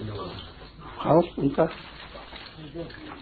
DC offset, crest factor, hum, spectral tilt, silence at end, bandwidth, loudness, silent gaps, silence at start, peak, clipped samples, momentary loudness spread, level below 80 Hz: under 0.1%; 22 dB; none; -10 dB/octave; 0 s; 4.8 kHz; -26 LUFS; none; 0 s; -8 dBFS; under 0.1%; 20 LU; -50 dBFS